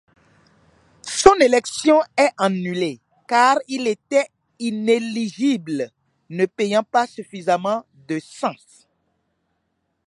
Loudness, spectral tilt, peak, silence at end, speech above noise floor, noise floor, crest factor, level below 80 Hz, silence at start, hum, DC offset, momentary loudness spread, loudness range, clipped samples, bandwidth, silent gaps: -20 LUFS; -4 dB/octave; 0 dBFS; 1.5 s; 52 dB; -72 dBFS; 20 dB; -54 dBFS; 1.05 s; none; under 0.1%; 13 LU; 6 LU; under 0.1%; 11.5 kHz; none